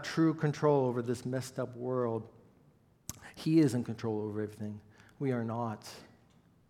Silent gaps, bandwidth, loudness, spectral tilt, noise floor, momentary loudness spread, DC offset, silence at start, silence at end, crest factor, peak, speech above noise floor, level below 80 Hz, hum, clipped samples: none; 15 kHz; -33 LUFS; -7 dB/octave; -65 dBFS; 19 LU; under 0.1%; 0 s; 0.65 s; 20 dB; -14 dBFS; 33 dB; -72 dBFS; none; under 0.1%